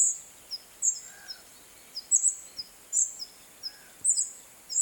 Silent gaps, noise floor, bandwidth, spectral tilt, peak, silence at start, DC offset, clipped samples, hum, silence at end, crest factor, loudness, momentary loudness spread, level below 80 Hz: none; -52 dBFS; 18.5 kHz; 3 dB/octave; -10 dBFS; 0 s; under 0.1%; under 0.1%; none; 0 s; 22 dB; -27 LUFS; 19 LU; -74 dBFS